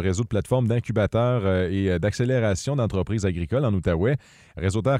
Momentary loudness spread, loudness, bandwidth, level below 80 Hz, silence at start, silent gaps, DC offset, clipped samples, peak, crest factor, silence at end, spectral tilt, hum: 4 LU; -24 LUFS; 11.5 kHz; -42 dBFS; 0 s; none; under 0.1%; under 0.1%; -10 dBFS; 14 dB; 0 s; -7 dB/octave; none